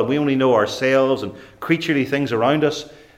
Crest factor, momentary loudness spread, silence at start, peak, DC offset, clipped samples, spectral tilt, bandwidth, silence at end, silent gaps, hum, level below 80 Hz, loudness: 16 dB; 10 LU; 0 s; -4 dBFS; under 0.1%; under 0.1%; -6 dB/octave; 15.5 kHz; 0.25 s; none; none; -58 dBFS; -19 LUFS